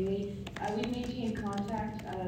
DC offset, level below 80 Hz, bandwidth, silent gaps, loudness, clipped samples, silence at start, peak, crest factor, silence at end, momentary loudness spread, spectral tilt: under 0.1%; -54 dBFS; 16 kHz; none; -36 LUFS; under 0.1%; 0 s; -16 dBFS; 18 dB; 0 s; 4 LU; -6.5 dB/octave